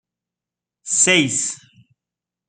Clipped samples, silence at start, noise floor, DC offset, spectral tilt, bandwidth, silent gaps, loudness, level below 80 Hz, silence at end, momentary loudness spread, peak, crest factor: under 0.1%; 0.85 s; -88 dBFS; under 0.1%; -1.5 dB/octave; 9.8 kHz; none; -16 LUFS; -68 dBFS; 0.9 s; 22 LU; -2 dBFS; 22 dB